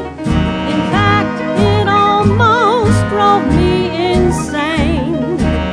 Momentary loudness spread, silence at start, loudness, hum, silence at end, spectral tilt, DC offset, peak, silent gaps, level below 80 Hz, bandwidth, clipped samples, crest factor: 6 LU; 0 s; -13 LUFS; none; 0 s; -6.5 dB/octave; under 0.1%; 0 dBFS; none; -26 dBFS; 11 kHz; under 0.1%; 12 dB